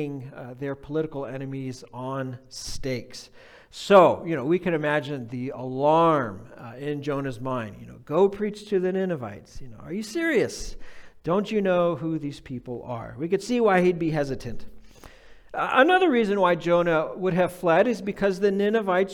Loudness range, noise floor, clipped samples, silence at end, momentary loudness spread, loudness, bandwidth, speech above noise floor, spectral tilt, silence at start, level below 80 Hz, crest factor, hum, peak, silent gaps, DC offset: 6 LU; -47 dBFS; under 0.1%; 0 s; 17 LU; -24 LUFS; 16 kHz; 23 dB; -6 dB/octave; 0 s; -50 dBFS; 20 dB; none; -4 dBFS; none; under 0.1%